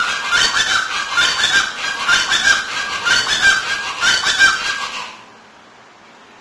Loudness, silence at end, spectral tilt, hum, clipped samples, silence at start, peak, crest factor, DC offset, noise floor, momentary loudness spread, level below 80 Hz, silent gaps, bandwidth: -14 LUFS; 1.15 s; 1 dB/octave; none; under 0.1%; 0 s; 0 dBFS; 18 dB; under 0.1%; -44 dBFS; 8 LU; -48 dBFS; none; 11 kHz